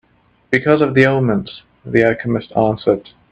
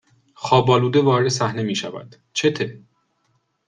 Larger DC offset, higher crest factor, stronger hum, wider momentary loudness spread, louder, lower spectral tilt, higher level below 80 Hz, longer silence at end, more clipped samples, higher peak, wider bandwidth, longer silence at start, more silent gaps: neither; about the same, 16 dB vs 20 dB; neither; second, 9 LU vs 15 LU; first, -16 LUFS vs -19 LUFS; first, -8 dB/octave vs -5.5 dB/octave; first, -50 dBFS vs -58 dBFS; second, 0.3 s vs 0.9 s; neither; about the same, 0 dBFS vs -2 dBFS; second, 8.4 kHz vs 9.8 kHz; about the same, 0.5 s vs 0.4 s; neither